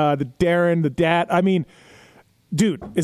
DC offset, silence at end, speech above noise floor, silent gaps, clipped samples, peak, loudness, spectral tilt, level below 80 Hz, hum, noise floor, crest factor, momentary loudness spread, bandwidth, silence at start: under 0.1%; 0 s; 33 dB; none; under 0.1%; -6 dBFS; -20 LUFS; -6.5 dB/octave; -48 dBFS; none; -53 dBFS; 14 dB; 6 LU; 16 kHz; 0 s